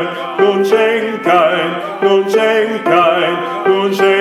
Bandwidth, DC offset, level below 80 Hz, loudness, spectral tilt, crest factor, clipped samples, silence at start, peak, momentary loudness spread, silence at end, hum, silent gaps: 14 kHz; under 0.1%; -64 dBFS; -13 LUFS; -5 dB/octave; 12 dB; under 0.1%; 0 s; 0 dBFS; 5 LU; 0 s; none; none